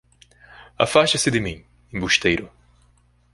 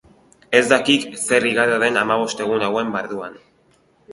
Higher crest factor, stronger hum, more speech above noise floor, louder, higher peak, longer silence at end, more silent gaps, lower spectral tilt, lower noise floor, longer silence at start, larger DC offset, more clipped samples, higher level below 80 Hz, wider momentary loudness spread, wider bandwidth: about the same, 22 dB vs 20 dB; first, 60 Hz at -50 dBFS vs none; about the same, 38 dB vs 39 dB; about the same, -20 LUFS vs -18 LUFS; about the same, 0 dBFS vs 0 dBFS; first, 0.85 s vs 0 s; neither; about the same, -3.5 dB/octave vs -3 dB/octave; about the same, -58 dBFS vs -58 dBFS; about the same, 0.6 s vs 0.5 s; neither; neither; first, -46 dBFS vs -60 dBFS; first, 15 LU vs 11 LU; about the same, 11.5 kHz vs 11.5 kHz